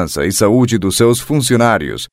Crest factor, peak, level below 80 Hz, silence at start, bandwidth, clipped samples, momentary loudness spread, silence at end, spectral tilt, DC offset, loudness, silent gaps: 12 dB; 0 dBFS; -40 dBFS; 0 s; 16 kHz; under 0.1%; 3 LU; 0.05 s; -5 dB/octave; under 0.1%; -13 LUFS; none